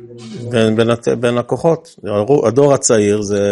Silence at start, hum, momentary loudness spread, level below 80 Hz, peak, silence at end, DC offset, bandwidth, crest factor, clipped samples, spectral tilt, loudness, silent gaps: 0 s; none; 9 LU; -52 dBFS; 0 dBFS; 0 s; under 0.1%; 11.5 kHz; 14 dB; under 0.1%; -5 dB/octave; -14 LUFS; none